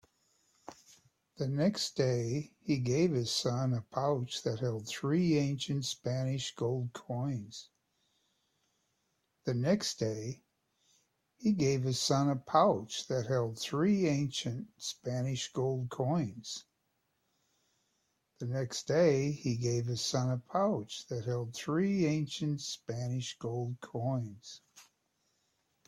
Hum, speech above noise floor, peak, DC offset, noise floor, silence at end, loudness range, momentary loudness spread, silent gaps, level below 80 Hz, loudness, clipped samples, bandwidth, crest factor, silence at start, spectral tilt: none; 47 dB; -14 dBFS; under 0.1%; -80 dBFS; 1.05 s; 7 LU; 11 LU; none; -70 dBFS; -33 LUFS; under 0.1%; 14.5 kHz; 20 dB; 0.7 s; -5.5 dB/octave